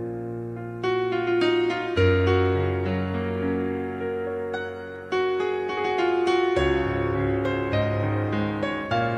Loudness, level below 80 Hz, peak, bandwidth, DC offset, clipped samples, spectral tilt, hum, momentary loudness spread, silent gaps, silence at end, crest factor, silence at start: -25 LUFS; -46 dBFS; -8 dBFS; 9 kHz; under 0.1%; under 0.1%; -7.5 dB/octave; none; 8 LU; none; 0 s; 16 dB; 0 s